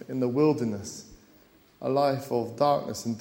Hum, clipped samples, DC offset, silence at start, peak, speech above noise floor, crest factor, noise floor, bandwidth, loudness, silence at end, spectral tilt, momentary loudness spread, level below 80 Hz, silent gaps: none; under 0.1%; under 0.1%; 0 s; -10 dBFS; 32 dB; 18 dB; -58 dBFS; 16.5 kHz; -27 LUFS; 0 s; -6 dB/octave; 12 LU; -64 dBFS; none